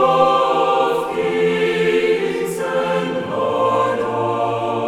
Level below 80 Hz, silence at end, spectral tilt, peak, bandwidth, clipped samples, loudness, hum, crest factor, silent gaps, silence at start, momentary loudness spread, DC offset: -58 dBFS; 0 s; -5.5 dB/octave; -2 dBFS; 15 kHz; under 0.1%; -18 LUFS; none; 16 dB; none; 0 s; 6 LU; under 0.1%